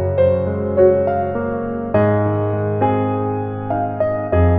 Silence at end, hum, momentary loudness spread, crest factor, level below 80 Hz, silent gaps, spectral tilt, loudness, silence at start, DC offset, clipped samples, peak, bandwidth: 0 s; none; 8 LU; 16 dB; -36 dBFS; none; -12.5 dB/octave; -18 LUFS; 0 s; under 0.1%; under 0.1%; -2 dBFS; 4 kHz